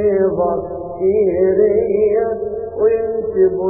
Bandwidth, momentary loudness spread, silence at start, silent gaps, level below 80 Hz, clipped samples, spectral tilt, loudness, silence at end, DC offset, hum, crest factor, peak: 2.7 kHz; 8 LU; 0 s; none; -44 dBFS; under 0.1%; -15.5 dB/octave; -16 LUFS; 0 s; under 0.1%; none; 12 dB; -4 dBFS